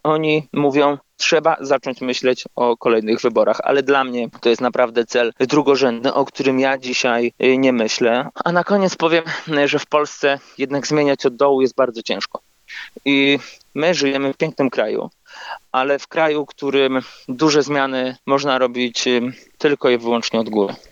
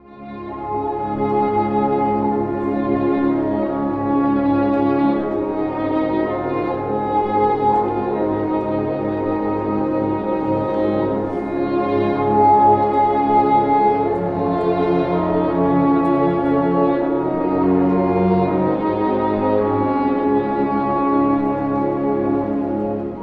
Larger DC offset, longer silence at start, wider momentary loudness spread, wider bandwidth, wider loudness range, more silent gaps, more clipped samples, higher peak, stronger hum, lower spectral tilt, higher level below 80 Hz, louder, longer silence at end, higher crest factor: neither; about the same, 0.05 s vs 0.1 s; about the same, 7 LU vs 6 LU; first, 7.8 kHz vs 5 kHz; about the same, 3 LU vs 4 LU; neither; neither; about the same, -2 dBFS vs -4 dBFS; neither; second, -4.5 dB/octave vs -10 dB/octave; second, -68 dBFS vs -46 dBFS; about the same, -18 LUFS vs -18 LUFS; first, 0.15 s vs 0 s; about the same, 16 dB vs 14 dB